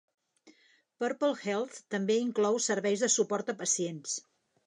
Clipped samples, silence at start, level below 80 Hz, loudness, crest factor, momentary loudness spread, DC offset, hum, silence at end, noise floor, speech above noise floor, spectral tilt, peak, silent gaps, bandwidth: under 0.1%; 0.45 s; -86 dBFS; -31 LUFS; 18 dB; 9 LU; under 0.1%; none; 0.45 s; -66 dBFS; 36 dB; -3 dB/octave; -14 dBFS; none; 11 kHz